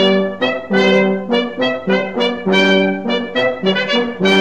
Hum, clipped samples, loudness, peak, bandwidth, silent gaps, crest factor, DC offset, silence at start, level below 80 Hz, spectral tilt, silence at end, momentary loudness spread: none; under 0.1%; -15 LUFS; 0 dBFS; 9 kHz; none; 14 dB; 0.8%; 0 s; -58 dBFS; -5.5 dB/octave; 0 s; 6 LU